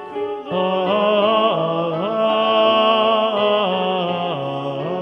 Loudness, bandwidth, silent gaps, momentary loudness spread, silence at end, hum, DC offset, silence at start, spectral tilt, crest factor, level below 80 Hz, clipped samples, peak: -18 LUFS; 6 kHz; none; 9 LU; 0 s; none; under 0.1%; 0 s; -7 dB/octave; 16 dB; -66 dBFS; under 0.1%; -4 dBFS